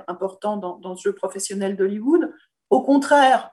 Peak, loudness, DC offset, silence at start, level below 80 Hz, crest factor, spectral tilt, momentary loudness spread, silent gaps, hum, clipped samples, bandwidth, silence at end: -4 dBFS; -21 LUFS; under 0.1%; 0.1 s; -74 dBFS; 16 dB; -4.5 dB/octave; 14 LU; none; none; under 0.1%; 12.5 kHz; 0.05 s